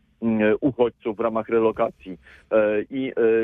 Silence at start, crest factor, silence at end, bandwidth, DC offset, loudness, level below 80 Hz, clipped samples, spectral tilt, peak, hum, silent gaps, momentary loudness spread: 0.2 s; 14 dB; 0 s; 3.8 kHz; under 0.1%; -23 LUFS; -56 dBFS; under 0.1%; -9.5 dB/octave; -8 dBFS; none; none; 7 LU